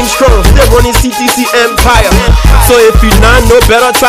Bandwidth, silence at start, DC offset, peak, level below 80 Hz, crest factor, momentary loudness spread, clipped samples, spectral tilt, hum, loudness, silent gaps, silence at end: 16.5 kHz; 0 s; 1%; 0 dBFS; -8 dBFS; 4 dB; 4 LU; 8%; -4 dB/octave; none; -6 LUFS; none; 0 s